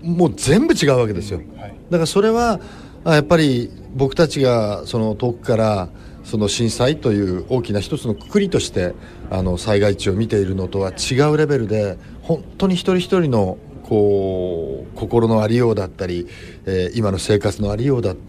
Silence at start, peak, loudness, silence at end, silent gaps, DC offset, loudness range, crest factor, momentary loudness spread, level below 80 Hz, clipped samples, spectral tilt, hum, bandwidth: 0 s; 0 dBFS; -19 LUFS; 0 s; none; under 0.1%; 2 LU; 18 dB; 11 LU; -38 dBFS; under 0.1%; -6 dB/octave; none; 15 kHz